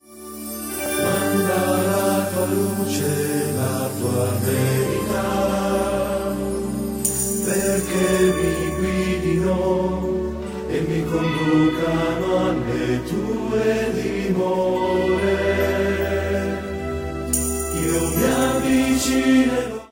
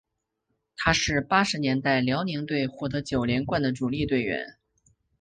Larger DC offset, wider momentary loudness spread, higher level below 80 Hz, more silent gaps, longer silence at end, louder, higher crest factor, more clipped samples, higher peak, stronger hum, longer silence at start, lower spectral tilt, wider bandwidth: neither; about the same, 7 LU vs 8 LU; first, -38 dBFS vs -48 dBFS; neither; second, 0.05 s vs 0.7 s; first, -21 LUFS vs -26 LUFS; second, 16 dB vs 22 dB; neither; about the same, -4 dBFS vs -6 dBFS; neither; second, 0.1 s vs 0.8 s; about the same, -5 dB/octave vs -5 dB/octave; first, 16.5 kHz vs 9.6 kHz